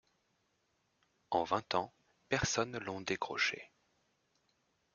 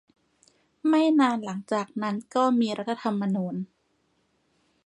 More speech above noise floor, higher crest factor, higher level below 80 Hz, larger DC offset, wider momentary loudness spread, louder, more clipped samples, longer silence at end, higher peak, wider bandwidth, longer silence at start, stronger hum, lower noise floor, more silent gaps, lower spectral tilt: about the same, 43 dB vs 46 dB; first, 24 dB vs 18 dB; first, -66 dBFS vs -76 dBFS; neither; second, 7 LU vs 10 LU; second, -36 LUFS vs -26 LUFS; neither; about the same, 1.3 s vs 1.2 s; second, -16 dBFS vs -10 dBFS; second, 9.6 kHz vs 11 kHz; first, 1.3 s vs 0.85 s; neither; first, -79 dBFS vs -70 dBFS; neither; second, -3 dB/octave vs -6.5 dB/octave